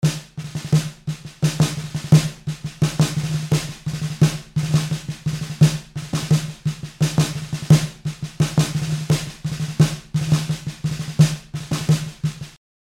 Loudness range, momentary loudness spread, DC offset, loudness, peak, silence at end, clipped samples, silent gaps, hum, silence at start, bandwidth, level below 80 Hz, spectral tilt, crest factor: 2 LU; 13 LU; under 0.1%; -22 LUFS; -2 dBFS; 0.45 s; under 0.1%; none; none; 0 s; 15 kHz; -44 dBFS; -6 dB/octave; 18 dB